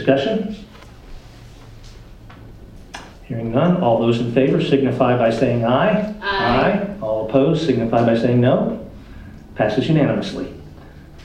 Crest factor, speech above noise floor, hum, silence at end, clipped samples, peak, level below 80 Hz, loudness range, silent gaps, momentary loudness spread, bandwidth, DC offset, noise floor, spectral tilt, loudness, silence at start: 18 dB; 23 dB; none; 0 s; under 0.1%; -2 dBFS; -42 dBFS; 8 LU; none; 21 LU; 9.6 kHz; under 0.1%; -40 dBFS; -7.5 dB/octave; -18 LUFS; 0 s